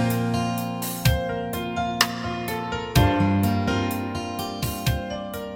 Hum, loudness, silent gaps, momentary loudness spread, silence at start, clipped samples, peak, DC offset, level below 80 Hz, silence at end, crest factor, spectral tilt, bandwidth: none; -25 LUFS; none; 8 LU; 0 s; under 0.1%; -2 dBFS; under 0.1%; -36 dBFS; 0 s; 22 dB; -5 dB/octave; 17 kHz